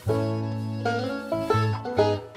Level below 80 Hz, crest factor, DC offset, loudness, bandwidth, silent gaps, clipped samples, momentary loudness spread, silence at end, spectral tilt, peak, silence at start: -58 dBFS; 16 dB; under 0.1%; -26 LUFS; 13.5 kHz; none; under 0.1%; 5 LU; 0 s; -7 dB/octave; -10 dBFS; 0 s